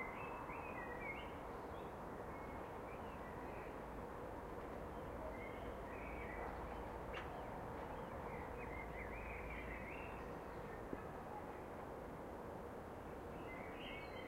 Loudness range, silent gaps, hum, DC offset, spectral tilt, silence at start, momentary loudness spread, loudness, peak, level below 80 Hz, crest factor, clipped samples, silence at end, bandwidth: 2 LU; none; none; under 0.1%; -6.5 dB/octave; 0 s; 3 LU; -50 LUFS; -30 dBFS; -58 dBFS; 18 dB; under 0.1%; 0 s; 16 kHz